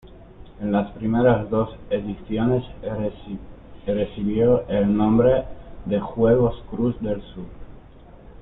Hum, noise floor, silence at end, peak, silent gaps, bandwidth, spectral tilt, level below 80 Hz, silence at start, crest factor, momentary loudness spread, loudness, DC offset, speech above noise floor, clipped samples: none; -45 dBFS; 0 s; -6 dBFS; none; 4 kHz; -12 dB/octave; -42 dBFS; 0.1 s; 16 dB; 18 LU; -22 LUFS; under 0.1%; 23 dB; under 0.1%